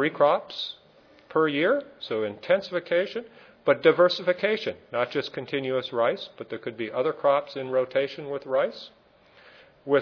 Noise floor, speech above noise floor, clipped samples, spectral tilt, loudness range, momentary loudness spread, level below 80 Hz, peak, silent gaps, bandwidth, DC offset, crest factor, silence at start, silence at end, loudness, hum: -56 dBFS; 30 dB; under 0.1%; -6 dB/octave; 4 LU; 13 LU; -74 dBFS; -6 dBFS; none; 5.4 kHz; under 0.1%; 22 dB; 0 s; 0 s; -26 LUFS; none